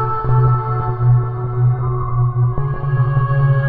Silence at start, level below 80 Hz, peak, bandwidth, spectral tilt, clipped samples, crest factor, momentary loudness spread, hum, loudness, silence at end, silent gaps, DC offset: 0 s; -30 dBFS; -4 dBFS; 3.2 kHz; -12.5 dB/octave; under 0.1%; 12 dB; 5 LU; none; -17 LUFS; 0 s; none; under 0.1%